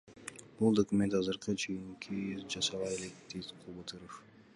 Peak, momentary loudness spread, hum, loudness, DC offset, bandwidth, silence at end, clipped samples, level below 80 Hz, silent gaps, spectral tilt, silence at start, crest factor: -16 dBFS; 18 LU; none; -35 LUFS; under 0.1%; 11.5 kHz; 0.3 s; under 0.1%; -66 dBFS; none; -4.5 dB/octave; 0.05 s; 20 dB